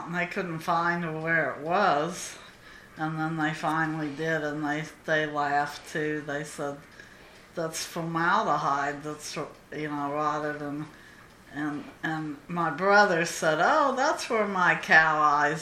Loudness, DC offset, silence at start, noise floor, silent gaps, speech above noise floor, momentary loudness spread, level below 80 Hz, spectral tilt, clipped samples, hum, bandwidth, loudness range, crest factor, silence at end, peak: -27 LUFS; under 0.1%; 0 s; -51 dBFS; none; 24 dB; 14 LU; -64 dBFS; -4.5 dB/octave; under 0.1%; none; 15.5 kHz; 8 LU; 24 dB; 0 s; -4 dBFS